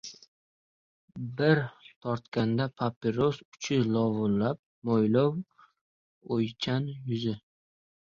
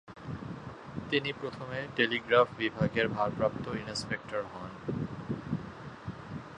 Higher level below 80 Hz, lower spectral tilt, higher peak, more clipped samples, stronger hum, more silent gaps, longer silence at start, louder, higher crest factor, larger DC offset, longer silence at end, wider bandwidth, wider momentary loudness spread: second, -64 dBFS vs -58 dBFS; first, -7 dB/octave vs -5.5 dB/octave; about the same, -10 dBFS vs -10 dBFS; neither; neither; first, 0.28-1.08 s, 1.96-2.01 s, 2.96-3.01 s, 3.45-3.52 s, 4.59-4.82 s, 5.81-6.21 s vs none; about the same, 0.05 s vs 0.05 s; first, -29 LUFS vs -33 LUFS; about the same, 20 dB vs 24 dB; neither; first, 0.75 s vs 0 s; second, 7.4 kHz vs 10.5 kHz; second, 14 LU vs 17 LU